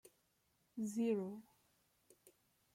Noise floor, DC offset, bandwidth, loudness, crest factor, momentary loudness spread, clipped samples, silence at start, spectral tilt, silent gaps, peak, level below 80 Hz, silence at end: -80 dBFS; under 0.1%; 16 kHz; -42 LUFS; 18 dB; 17 LU; under 0.1%; 0.05 s; -6.5 dB/octave; none; -28 dBFS; -88 dBFS; 0.45 s